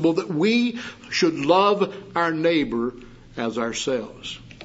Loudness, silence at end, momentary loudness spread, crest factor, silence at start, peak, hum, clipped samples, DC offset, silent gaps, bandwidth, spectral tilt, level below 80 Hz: -22 LUFS; 0 s; 15 LU; 20 dB; 0 s; -4 dBFS; none; under 0.1%; under 0.1%; none; 8 kHz; -4.5 dB/octave; -54 dBFS